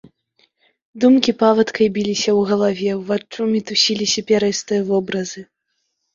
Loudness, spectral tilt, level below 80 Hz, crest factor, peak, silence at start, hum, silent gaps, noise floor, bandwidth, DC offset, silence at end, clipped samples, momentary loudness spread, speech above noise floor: -17 LUFS; -4 dB/octave; -60 dBFS; 18 dB; 0 dBFS; 0.95 s; none; none; -72 dBFS; 7.6 kHz; under 0.1%; 0.7 s; under 0.1%; 9 LU; 55 dB